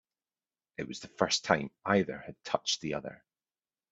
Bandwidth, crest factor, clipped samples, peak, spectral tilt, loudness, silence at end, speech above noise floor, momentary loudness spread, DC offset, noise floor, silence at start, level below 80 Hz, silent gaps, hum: 8.4 kHz; 26 dB; under 0.1%; -8 dBFS; -3.5 dB/octave; -32 LUFS; 0.75 s; over 58 dB; 14 LU; under 0.1%; under -90 dBFS; 0.8 s; -68 dBFS; none; none